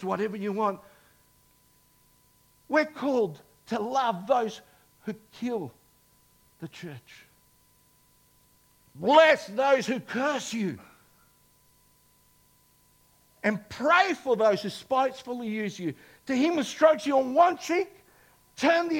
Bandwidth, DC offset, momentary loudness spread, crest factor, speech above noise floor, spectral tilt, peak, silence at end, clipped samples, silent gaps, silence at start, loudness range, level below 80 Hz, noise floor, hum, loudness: 17 kHz; under 0.1%; 19 LU; 22 dB; 37 dB; -4.5 dB/octave; -6 dBFS; 0 s; under 0.1%; none; 0 s; 13 LU; -72 dBFS; -63 dBFS; none; -26 LUFS